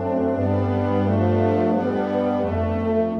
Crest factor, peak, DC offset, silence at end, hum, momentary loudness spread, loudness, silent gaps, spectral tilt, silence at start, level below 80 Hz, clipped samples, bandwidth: 14 dB; -6 dBFS; under 0.1%; 0 s; 50 Hz at -40 dBFS; 3 LU; -21 LUFS; none; -10 dB/octave; 0 s; -46 dBFS; under 0.1%; 6 kHz